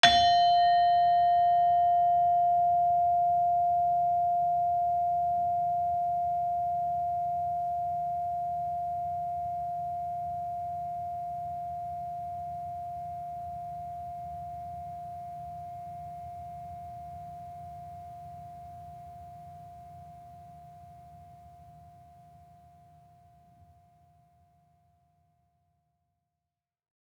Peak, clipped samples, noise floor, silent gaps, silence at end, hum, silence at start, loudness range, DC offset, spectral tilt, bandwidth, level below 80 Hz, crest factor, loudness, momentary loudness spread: -6 dBFS; under 0.1%; -89 dBFS; none; 5.25 s; none; 0.05 s; 22 LU; under 0.1%; -3.5 dB/octave; 9 kHz; -62 dBFS; 26 dB; -28 LUFS; 22 LU